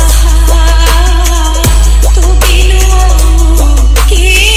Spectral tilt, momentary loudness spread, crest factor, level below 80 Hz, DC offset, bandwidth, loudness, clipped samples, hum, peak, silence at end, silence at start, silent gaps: -3.5 dB/octave; 2 LU; 4 dB; -6 dBFS; under 0.1%; 15.5 kHz; -8 LUFS; 1%; none; 0 dBFS; 0 s; 0 s; none